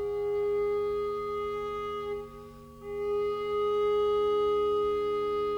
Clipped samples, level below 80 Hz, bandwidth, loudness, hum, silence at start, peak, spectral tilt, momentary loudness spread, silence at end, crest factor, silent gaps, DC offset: under 0.1%; -56 dBFS; 7 kHz; -30 LUFS; none; 0 s; -22 dBFS; -6 dB/octave; 12 LU; 0 s; 8 dB; none; under 0.1%